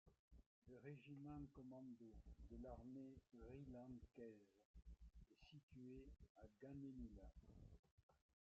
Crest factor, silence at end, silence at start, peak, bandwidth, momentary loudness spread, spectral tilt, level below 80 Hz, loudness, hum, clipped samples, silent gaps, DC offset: 16 dB; 0.4 s; 0.05 s; -44 dBFS; 7.4 kHz; 10 LU; -8 dB/octave; -70 dBFS; -62 LUFS; none; under 0.1%; 0.19-0.28 s, 0.46-0.62 s, 4.65-4.74 s, 5.63-5.68 s, 6.29-6.35 s, 7.79-7.83 s, 7.91-8.09 s; under 0.1%